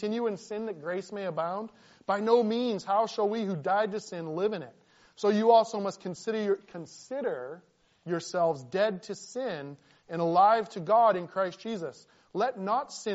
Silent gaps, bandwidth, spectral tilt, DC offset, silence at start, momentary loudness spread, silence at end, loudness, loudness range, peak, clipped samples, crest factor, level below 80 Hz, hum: none; 8 kHz; -4.5 dB/octave; under 0.1%; 0 s; 16 LU; 0 s; -29 LUFS; 5 LU; -10 dBFS; under 0.1%; 20 dB; -78 dBFS; none